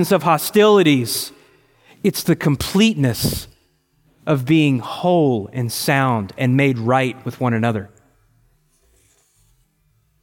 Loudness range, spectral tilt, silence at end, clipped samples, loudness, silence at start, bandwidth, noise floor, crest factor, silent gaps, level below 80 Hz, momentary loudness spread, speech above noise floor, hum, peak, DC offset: 5 LU; -5.5 dB/octave; 2.35 s; under 0.1%; -18 LUFS; 0 s; 17 kHz; -62 dBFS; 16 dB; none; -48 dBFS; 10 LU; 45 dB; none; -2 dBFS; under 0.1%